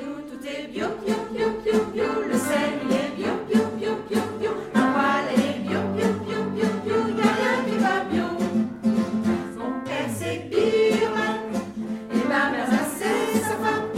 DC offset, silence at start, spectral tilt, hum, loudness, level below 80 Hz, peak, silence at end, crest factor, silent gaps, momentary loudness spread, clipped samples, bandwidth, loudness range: under 0.1%; 0 s; -5 dB/octave; none; -24 LUFS; -58 dBFS; -6 dBFS; 0 s; 18 dB; none; 8 LU; under 0.1%; 16 kHz; 2 LU